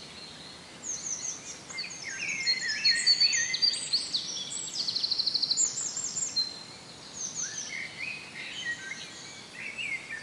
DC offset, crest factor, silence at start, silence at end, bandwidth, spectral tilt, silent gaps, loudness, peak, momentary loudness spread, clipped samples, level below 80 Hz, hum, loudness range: under 0.1%; 18 dB; 0 s; 0 s; 12 kHz; 1.5 dB/octave; none; -28 LUFS; -14 dBFS; 19 LU; under 0.1%; -72 dBFS; none; 10 LU